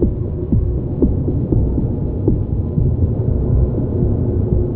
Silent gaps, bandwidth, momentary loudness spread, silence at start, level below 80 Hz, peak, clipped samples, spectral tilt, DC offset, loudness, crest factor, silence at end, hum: none; 1.8 kHz; 3 LU; 0 s; -22 dBFS; -2 dBFS; under 0.1%; -14.5 dB/octave; under 0.1%; -18 LUFS; 16 dB; 0 s; none